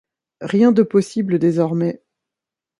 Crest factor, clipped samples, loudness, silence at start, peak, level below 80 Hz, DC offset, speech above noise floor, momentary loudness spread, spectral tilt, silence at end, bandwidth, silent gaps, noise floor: 16 dB; under 0.1%; -17 LUFS; 0.4 s; -2 dBFS; -64 dBFS; under 0.1%; 71 dB; 12 LU; -8 dB/octave; 0.85 s; 11.5 kHz; none; -87 dBFS